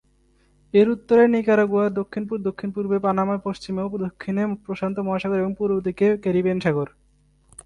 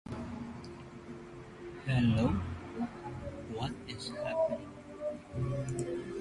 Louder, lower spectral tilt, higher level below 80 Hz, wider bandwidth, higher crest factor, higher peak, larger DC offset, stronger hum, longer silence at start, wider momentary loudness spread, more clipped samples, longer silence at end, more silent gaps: first, -22 LUFS vs -36 LUFS; about the same, -8 dB/octave vs -7 dB/octave; about the same, -56 dBFS vs -52 dBFS; about the same, 10.5 kHz vs 11.5 kHz; about the same, 16 dB vs 18 dB; first, -6 dBFS vs -18 dBFS; neither; neither; first, 0.75 s vs 0.05 s; second, 11 LU vs 17 LU; neither; first, 0.75 s vs 0 s; neither